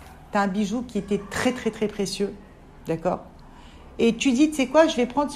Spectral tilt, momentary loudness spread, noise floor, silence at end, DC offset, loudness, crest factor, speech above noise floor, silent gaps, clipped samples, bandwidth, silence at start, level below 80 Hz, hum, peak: -5 dB/octave; 12 LU; -45 dBFS; 0 s; under 0.1%; -24 LUFS; 20 dB; 22 dB; none; under 0.1%; 15 kHz; 0 s; -50 dBFS; none; -6 dBFS